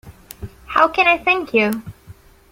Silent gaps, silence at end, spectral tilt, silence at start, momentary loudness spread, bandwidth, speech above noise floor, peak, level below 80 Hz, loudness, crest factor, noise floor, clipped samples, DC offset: none; 0.4 s; -4.5 dB/octave; 0.05 s; 22 LU; 16.5 kHz; 28 dB; 0 dBFS; -46 dBFS; -16 LUFS; 20 dB; -44 dBFS; under 0.1%; under 0.1%